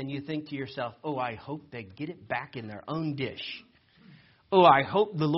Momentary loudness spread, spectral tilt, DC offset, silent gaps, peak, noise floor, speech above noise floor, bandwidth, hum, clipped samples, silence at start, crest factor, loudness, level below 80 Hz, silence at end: 20 LU; -4 dB/octave; under 0.1%; none; -6 dBFS; -57 dBFS; 28 dB; 5.8 kHz; none; under 0.1%; 0 s; 22 dB; -28 LUFS; -66 dBFS; 0 s